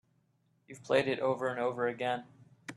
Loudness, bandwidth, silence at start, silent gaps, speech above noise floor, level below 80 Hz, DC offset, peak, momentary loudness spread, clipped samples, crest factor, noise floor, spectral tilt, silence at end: -33 LUFS; 11.5 kHz; 0.7 s; none; 41 dB; -76 dBFS; under 0.1%; -14 dBFS; 13 LU; under 0.1%; 22 dB; -73 dBFS; -5.5 dB/octave; 0 s